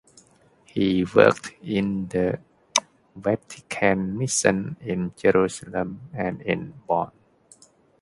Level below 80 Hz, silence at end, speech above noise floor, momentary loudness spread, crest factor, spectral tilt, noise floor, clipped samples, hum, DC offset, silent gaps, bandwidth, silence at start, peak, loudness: -54 dBFS; 0.95 s; 34 dB; 11 LU; 24 dB; -4.5 dB/octave; -57 dBFS; under 0.1%; none; under 0.1%; none; 11.5 kHz; 0.75 s; 0 dBFS; -24 LUFS